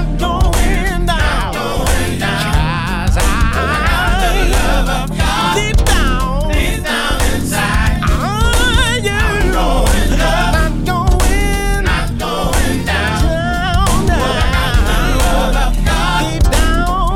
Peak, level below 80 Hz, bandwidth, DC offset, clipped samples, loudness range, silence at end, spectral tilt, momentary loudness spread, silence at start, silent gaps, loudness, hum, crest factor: -2 dBFS; -16 dBFS; 16.5 kHz; under 0.1%; under 0.1%; 1 LU; 0 s; -4.5 dB/octave; 3 LU; 0 s; none; -15 LUFS; none; 10 dB